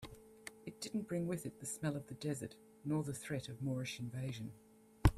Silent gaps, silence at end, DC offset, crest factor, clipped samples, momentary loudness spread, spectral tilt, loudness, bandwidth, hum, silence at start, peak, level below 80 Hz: none; 0 s; under 0.1%; 28 dB; under 0.1%; 12 LU; -5.5 dB/octave; -43 LUFS; 15 kHz; none; 0 s; -12 dBFS; -50 dBFS